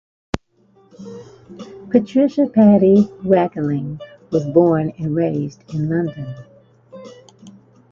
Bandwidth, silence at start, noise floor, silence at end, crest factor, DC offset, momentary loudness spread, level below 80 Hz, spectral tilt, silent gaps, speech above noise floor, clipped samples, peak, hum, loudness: 7.2 kHz; 0.35 s; -55 dBFS; 0.4 s; 18 dB; under 0.1%; 24 LU; -50 dBFS; -9 dB/octave; none; 39 dB; under 0.1%; 0 dBFS; none; -17 LUFS